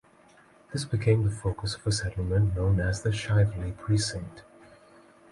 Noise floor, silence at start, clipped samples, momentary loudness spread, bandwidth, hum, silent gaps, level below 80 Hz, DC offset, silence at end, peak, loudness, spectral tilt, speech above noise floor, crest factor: -58 dBFS; 0.7 s; under 0.1%; 10 LU; 11.5 kHz; none; none; -42 dBFS; under 0.1%; 0.9 s; -12 dBFS; -28 LUFS; -5.5 dB/octave; 31 dB; 16 dB